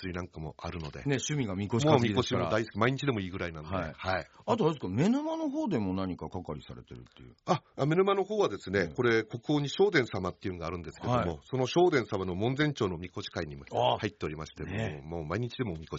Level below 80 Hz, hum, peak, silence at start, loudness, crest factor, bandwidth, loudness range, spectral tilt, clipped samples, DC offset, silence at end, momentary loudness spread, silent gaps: -58 dBFS; none; -8 dBFS; 0 s; -31 LUFS; 22 dB; 7.6 kHz; 3 LU; -5 dB/octave; under 0.1%; under 0.1%; 0 s; 13 LU; none